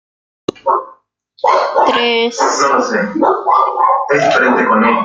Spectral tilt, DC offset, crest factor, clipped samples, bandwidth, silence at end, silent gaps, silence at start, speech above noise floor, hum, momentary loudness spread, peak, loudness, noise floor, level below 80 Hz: -3.5 dB/octave; under 0.1%; 12 dB; under 0.1%; 9.4 kHz; 0 s; none; 0.65 s; 37 dB; none; 7 LU; 0 dBFS; -13 LUFS; -49 dBFS; -62 dBFS